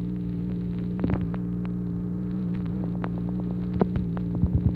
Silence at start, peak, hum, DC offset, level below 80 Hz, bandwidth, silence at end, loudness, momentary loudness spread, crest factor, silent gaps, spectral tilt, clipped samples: 0 s; -8 dBFS; 60 Hz at -40 dBFS; under 0.1%; -38 dBFS; 4.5 kHz; 0 s; -29 LUFS; 4 LU; 20 dB; none; -11.5 dB/octave; under 0.1%